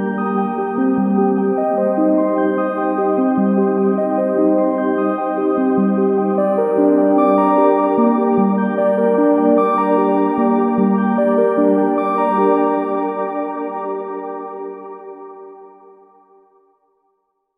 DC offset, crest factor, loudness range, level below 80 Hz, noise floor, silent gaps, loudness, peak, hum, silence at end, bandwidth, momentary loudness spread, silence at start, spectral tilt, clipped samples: under 0.1%; 14 dB; 12 LU; -64 dBFS; -68 dBFS; none; -16 LUFS; -2 dBFS; none; 1.9 s; 3.8 kHz; 11 LU; 0 s; -10 dB/octave; under 0.1%